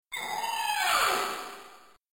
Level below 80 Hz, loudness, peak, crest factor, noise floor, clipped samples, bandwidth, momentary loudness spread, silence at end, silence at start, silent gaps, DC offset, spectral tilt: -64 dBFS; -28 LUFS; -14 dBFS; 16 dB; -53 dBFS; under 0.1%; 17 kHz; 16 LU; 0.35 s; 0.1 s; none; under 0.1%; 0.5 dB/octave